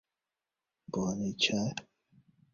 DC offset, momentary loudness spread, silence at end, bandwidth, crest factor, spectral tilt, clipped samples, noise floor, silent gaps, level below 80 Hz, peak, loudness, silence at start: under 0.1%; 11 LU; 0.7 s; 7.4 kHz; 24 dB; -3.5 dB/octave; under 0.1%; under -90 dBFS; none; -66 dBFS; -14 dBFS; -32 LUFS; 0.9 s